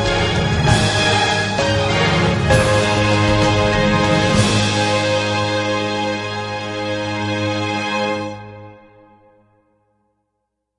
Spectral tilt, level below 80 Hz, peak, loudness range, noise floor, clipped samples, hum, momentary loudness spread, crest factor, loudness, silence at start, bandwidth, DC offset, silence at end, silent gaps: -4.5 dB/octave; -34 dBFS; 0 dBFS; 9 LU; -74 dBFS; under 0.1%; none; 8 LU; 18 dB; -17 LUFS; 0 s; 11.5 kHz; under 0.1%; 2.05 s; none